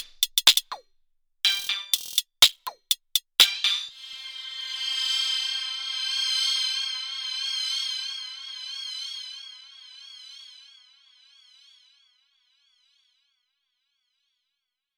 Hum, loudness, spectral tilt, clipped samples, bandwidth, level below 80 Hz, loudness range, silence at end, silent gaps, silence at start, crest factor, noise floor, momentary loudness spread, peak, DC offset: none; -24 LUFS; 3.5 dB/octave; under 0.1%; over 20 kHz; -70 dBFS; 15 LU; 4.35 s; none; 0 s; 28 dB; -83 dBFS; 23 LU; -2 dBFS; under 0.1%